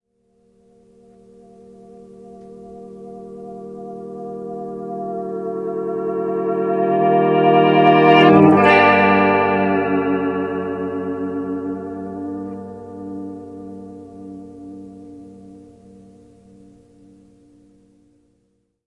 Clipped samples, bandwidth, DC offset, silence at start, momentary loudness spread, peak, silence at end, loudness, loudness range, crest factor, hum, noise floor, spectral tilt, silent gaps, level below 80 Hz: under 0.1%; 6.6 kHz; under 0.1%; 1.9 s; 26 LU; 0 dBFS; 3.25 s; -16 LUFS; 23 LU; 20 dB; none; -66 dBFS; -8 dB/octave; none; -60 dBFS